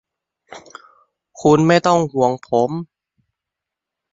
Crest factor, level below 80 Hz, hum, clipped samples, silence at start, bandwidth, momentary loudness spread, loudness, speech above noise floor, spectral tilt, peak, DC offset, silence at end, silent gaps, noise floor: 18 dB; -58 dBFS; none; under 0.1%; 0.5 s; 8 kHz; 25 LU; -16 LUFS; 68 dB; -6 dB/octave; -2 dBFS; under 0.1%; 1.3 s; none; -84 dBFS